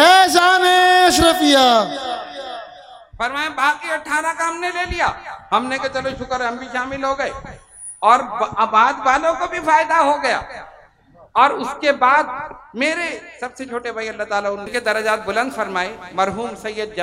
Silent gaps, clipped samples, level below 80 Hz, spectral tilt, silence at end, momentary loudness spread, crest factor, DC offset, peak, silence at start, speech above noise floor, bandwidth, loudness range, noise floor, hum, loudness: none; under 0.1%; -46 dBFS; -2.5 dB/octave; 0 s; 16 LU; 18 dB; under 0.1%; 0 dBFS; 0 s; 30 dB; 16 kHz; 6 LU; -49 dBFS; none; -17 LUFS